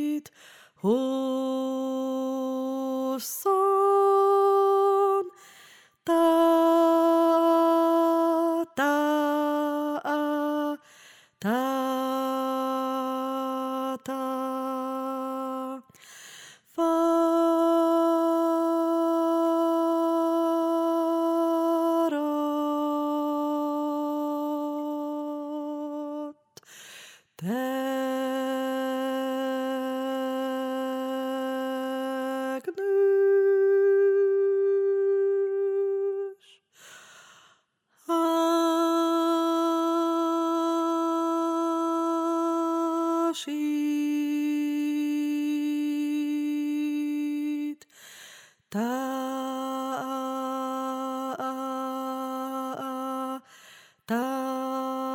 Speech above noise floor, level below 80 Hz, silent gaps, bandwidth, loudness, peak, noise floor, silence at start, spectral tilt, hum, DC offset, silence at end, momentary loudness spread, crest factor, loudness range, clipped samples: 40 dB; -86 dBFS; none; 17 kHz; -26 LUFS; -10 dBFS; -67 dBFS; 0 s; -5 dB/octave; none; under 0.1%; 0 s; 11 LU; 16 dB; 9 LU; under 0.1%